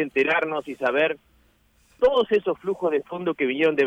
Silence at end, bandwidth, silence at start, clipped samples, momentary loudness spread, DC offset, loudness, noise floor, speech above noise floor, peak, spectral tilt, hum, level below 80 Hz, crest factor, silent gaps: 0 s; 8.8 kHz; 0 s; under 0.1%; 6 LU; under 0.1%; -23 LUFS; -61 dBFS; 39 dB; -10 dBFS; -6 dB/octave; none; -58 dBFS; 14 dB; none